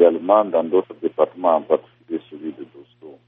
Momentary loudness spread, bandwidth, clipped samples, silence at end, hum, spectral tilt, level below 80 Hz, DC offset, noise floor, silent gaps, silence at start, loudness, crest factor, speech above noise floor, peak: 17 LU; 3.8 kHz; under 0.1%; 0.15 s; none; -5 dB/octave; -70 dBFS; under 0.1%; -43 dBFS; none; 0 s; -20 LUFS; 20 dB; 26 dB; 0 dBFS